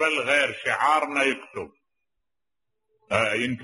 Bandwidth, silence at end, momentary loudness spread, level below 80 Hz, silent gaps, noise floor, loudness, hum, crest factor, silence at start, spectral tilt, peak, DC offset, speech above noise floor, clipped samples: 11.5 kHz; 0 s; 16 LU; -68 dBFS; none; -88 dBFS; -23 LUFS; none; 20 dB; 0 s; -3.5 dB/octave; -6 dBFS; under 0.1%; 64 dB; under 0.1%